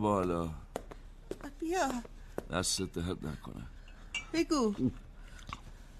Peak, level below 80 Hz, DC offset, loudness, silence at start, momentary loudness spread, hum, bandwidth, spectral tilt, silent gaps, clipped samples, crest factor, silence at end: -16 dBFS; -50 dBFS; under 0.1%; -35 LUFS; 0 s; 20 LU; none; 13 kHz; -4.5 dB/octave; none; under 0.1%; 20 dB; 0 s